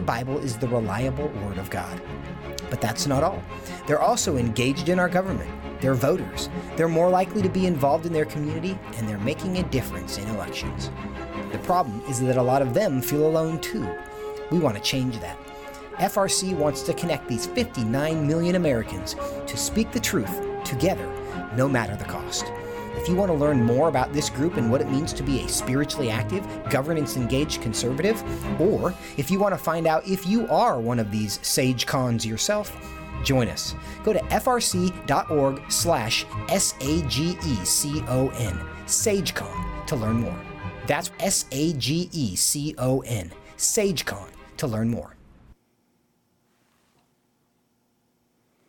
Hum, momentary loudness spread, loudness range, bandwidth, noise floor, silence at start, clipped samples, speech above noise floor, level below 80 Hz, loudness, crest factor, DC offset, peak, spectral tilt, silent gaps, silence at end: none; 11 LU; 4 LU; 18 kHz; -69 dBFS; 0 s; under 0.1%; 44 dB; -44 dBFS; -25 LUFS; 16 dB; under 0.1%; -8 dBFS; -4.5 dB/octave; none; 3.15 s